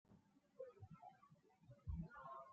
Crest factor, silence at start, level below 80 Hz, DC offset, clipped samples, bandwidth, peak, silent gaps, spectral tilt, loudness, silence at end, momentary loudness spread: 20 dB; 0.05 s; -64 dBFS; under 0.1%; under 0.1%; 7 kHz; -38 dBFS; none; -8.5 dB/octave; -57 LUFS; 0 s; 12 LU